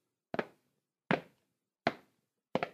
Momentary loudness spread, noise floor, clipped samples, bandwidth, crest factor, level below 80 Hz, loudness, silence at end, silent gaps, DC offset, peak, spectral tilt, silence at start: 11 LU; -83 dBFS; under 0.1%; 15 kHz; 32 dB; -76 dBFS; -38 LUFS; 0.05 s; none; under 0.1%; -10 dBFS; -6.5 dB/octave; 0.35 s